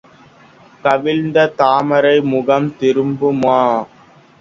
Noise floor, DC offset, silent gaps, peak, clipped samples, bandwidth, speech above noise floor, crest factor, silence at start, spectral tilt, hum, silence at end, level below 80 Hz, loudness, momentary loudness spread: -45 dBFS; under 0.1%; none; 0 dBFS; under 0.1%; 7.6 kHz; 31 dB; 16 dB; 0.85 s; -7 dB/octave; none; 0.55 s; -58 dBFS; -14 LUFS; 4 LU